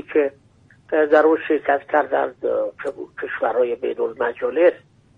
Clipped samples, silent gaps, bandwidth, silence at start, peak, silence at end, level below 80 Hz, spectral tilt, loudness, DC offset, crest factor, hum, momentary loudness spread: under 0.1%; none; 5 kHz; 0.1 s; -4 dBFS; 0.4 s; -64 dBFS; -6.5 dB/octave; -20 LUFS; under 0.1%; 18 dB; none; 11 LU